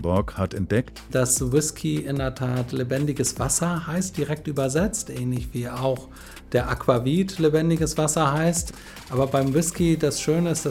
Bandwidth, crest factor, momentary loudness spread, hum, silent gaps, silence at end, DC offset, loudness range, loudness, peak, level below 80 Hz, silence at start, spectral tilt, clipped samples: 16.5 kHz; 18 dB; 7 LU; none; none; 0 s; under 0.1%; 3 LU; -24 LUFS; -6 dBFS; -42 dBFS; 0 s; -5 dB/octave; under 0.1%